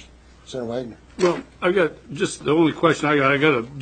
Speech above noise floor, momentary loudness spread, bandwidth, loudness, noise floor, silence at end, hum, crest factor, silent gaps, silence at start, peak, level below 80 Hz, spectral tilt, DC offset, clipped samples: 26 dB; 13 LU; 9.4 kHz; -21 LUFS; -46 dBFS; 0 s; none; 20 dB; none; 0.5 s; -2 dBFS; -52 dBFS; -5.5 dB/octave; under 0.1%; under 0.1%